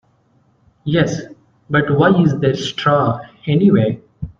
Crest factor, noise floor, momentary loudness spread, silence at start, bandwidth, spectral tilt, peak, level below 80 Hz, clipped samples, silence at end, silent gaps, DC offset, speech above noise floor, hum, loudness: 14 dB; -57 dBFS; 11 LU; 0.85 s; 7.6 kHz; -7 dB/octave; -2 dBFS; -48 dBFS; under 0.1%; 0.1 s; none; under 0.1%; 43 dB; none; -16 LUFS